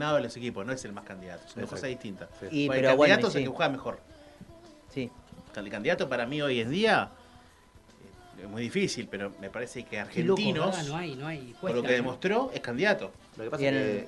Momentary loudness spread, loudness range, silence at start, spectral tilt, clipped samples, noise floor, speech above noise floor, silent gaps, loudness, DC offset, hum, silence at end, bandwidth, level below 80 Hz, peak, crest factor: 17 LU; 5 LU; 0 s; -5 dB/octave; under 0.1%; -57 dBFS; 27 dB; none; -29 LUFS; under 0.1%; none; 0 s; 12 kHz; -62 dBFS; -6 dBFS; 24 dB